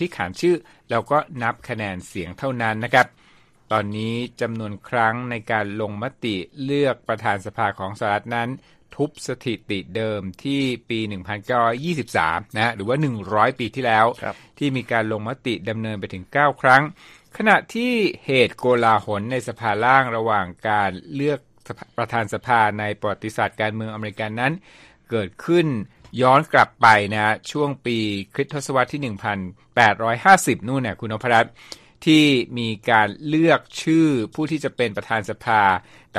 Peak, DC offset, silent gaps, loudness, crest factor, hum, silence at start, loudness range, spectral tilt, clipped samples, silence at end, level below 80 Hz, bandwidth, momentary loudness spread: 0 dBFS; under 0.1%; none; -21 LUFS; 22 dB; none; 0 s; 6 LU; -5.5 dB/octave; under 0.1%; 0 s; -58 dBFS; 14.5 kHz; 11 LU